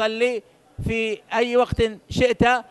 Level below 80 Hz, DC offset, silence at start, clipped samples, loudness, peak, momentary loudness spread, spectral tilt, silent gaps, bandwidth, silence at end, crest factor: -40 dBFS; under 0.1%; 0 s; under 0.1%; -22 LUFS; -4 dBFS; 8 LU; -5.5 dB/octave; none; 12 kHz; 0.1 s; 18 dB